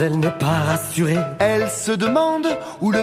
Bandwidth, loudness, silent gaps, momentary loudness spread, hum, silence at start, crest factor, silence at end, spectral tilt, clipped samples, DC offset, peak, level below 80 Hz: 16 kHz; -20 LUFS; none; 4 LU; none; 0 s; 14 dB; 0 s; -5.5 dB/octave; under 0.1%; under 0.1%; -4 dBFS; -52 dBFS